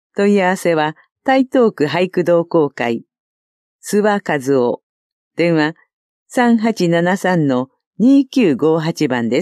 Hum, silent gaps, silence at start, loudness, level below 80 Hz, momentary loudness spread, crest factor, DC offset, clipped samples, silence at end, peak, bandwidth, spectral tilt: none; 1.12-1.16 s, 3.20-3.79 s, 4.83-5.31 s, 5.93-6.26 s, 7.87-7.91 s; 0.15 s; -16 LUFS; -68 dBFS; 8 LU; 14 dB; under 0.1%; under 0.1%; 0 s; -2 dBFS; 13.5 kHz; -6 dB/octave